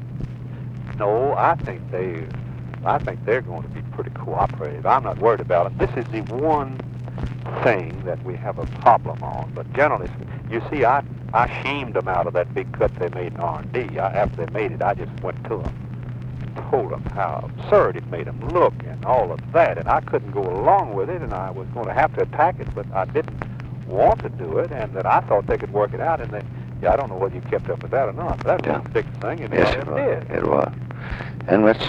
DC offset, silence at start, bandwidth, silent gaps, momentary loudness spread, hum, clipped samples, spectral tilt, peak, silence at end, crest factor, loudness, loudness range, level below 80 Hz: under 0.1%; 0 s; 7.4 kHz; none; 12 LU; none; under 0.1%; -8.5 dB/octave; -2 dBFS; 0 s; 20 dB; -22 LUFS; 4 LU; -40 dBFS